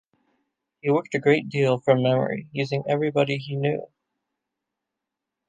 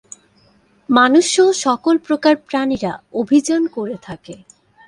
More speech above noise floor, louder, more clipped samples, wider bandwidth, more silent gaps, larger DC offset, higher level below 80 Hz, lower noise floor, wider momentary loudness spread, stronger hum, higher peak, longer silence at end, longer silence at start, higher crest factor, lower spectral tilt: first, 62 dB vs 39 dB; second, -23 LUFS vs -16 LUFS; neither; second, 9.2 kHz vs 11.5 kHz; neither; neither; second, -70 dBFS vs -56 dBFS; first, -85 dBFS vs -55 dBFS; second, 8 LU vs 15 LU; neither; second, -4 dBFS vs 0 dBFS; first, 1.65 s vs 0.5 s; about the same, 0.85 s vs 0.9 s; about the same, 20 dB vs 16 dB; first, -7 dB/octave vs -3.5 dB/octave